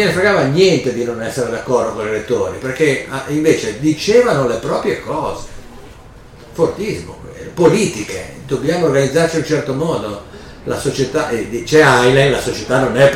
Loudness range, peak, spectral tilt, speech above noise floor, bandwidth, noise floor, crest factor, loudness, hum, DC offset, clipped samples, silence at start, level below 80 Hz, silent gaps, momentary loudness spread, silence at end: 5 LU; 0 dBFS; -5 dB/octave; 23 dB; 16 kHz; -38 dBFS; 14 dB; -15 LUFS; none; under 0.1%; under 0.1%; 0 s; -40 dBFS; none; 14 LU; 0 s